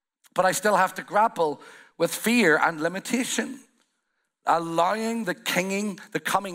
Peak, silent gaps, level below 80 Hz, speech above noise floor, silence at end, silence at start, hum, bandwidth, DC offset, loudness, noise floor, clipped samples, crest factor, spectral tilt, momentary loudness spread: -6 dBFS; none; -74 dBFS; 52 dB; 0 s; 0.35 s; none; 16 kHz; under 0.1%; -24 LUFS; -77 dBFS; under 0.1%; 20 dB; -3.5 dB/octave; 10 LU